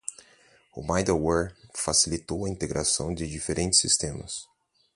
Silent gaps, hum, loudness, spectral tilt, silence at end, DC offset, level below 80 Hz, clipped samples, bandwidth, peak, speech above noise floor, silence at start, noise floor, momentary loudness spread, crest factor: none; none; -25 LUFS; -3 dB/octave; 0.5 s; under 0.1%; -46 dBFS; under 0.1%; 11.5 kHz; -8 dBFS; 32 dB; 0.1 s; -59 dBFS; 15 LU; 22 dB